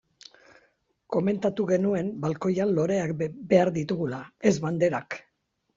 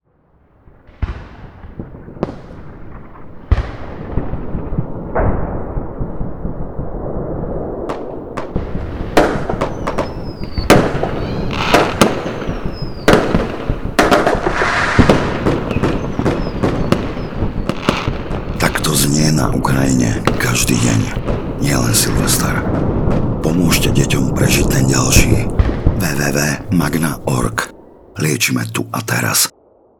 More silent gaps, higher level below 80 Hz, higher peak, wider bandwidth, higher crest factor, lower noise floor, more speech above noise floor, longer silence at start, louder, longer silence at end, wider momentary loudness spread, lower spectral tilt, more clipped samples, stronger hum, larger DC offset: neither; second, -64 dBFS vs -26 dBFS; second, -6 dBFS vs 0 dBFS; second, 7.6 kHz vs over 20 kHz; about the same, 20 dB vs 16 dB; first, -75 dBFS vs -54 dBFS; first, 50 dB vs 40 dB; about the same, 1.1 s vs 1 s; second, -26 LUFS vs -16 LUFS; about the same, 0.55 s vs 0.5 s; second, 9 LU vs 14 LU; first, -7 dB/octave vs -4.5 dB/octave; second, under 0.1% vs 0.1%; neither; neither